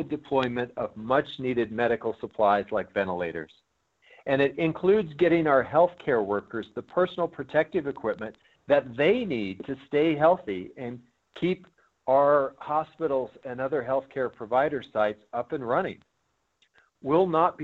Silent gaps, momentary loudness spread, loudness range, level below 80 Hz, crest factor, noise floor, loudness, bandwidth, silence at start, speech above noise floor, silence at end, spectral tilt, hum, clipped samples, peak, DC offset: none; 13 LU; 4 LU; -62 dBFS; 18 dB; -75 dBFS; -27 LUFS; 7.2 kHz; 0 s; 49 dB; 0 s; -8 dB/octave; none; under 0.1%; -8 dBFS; under 0.1%